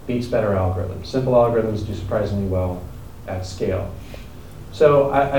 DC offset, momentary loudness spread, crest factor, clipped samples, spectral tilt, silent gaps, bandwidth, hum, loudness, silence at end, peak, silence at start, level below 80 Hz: 0.8%; 21 LU; 18 dB; under 0.1%; -7.5 dB/octave; none; 19.5 kHz; none; -21 LUFS; 0 s; -2 dBFS; 0 s; -40 dBFS